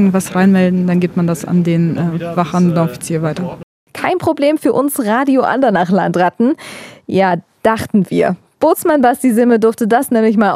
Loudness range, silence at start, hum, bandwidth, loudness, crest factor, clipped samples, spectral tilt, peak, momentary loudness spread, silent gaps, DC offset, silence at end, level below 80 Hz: 3 LU; 0 s; none; 15.5 kHz; -14 LUFS; 14 dB; under 0.1%; -6.5 dB/octave; 0 dBFS; 7 LU; 3.63-3.87 s; under 0.1%; 0 s; -54 dBFS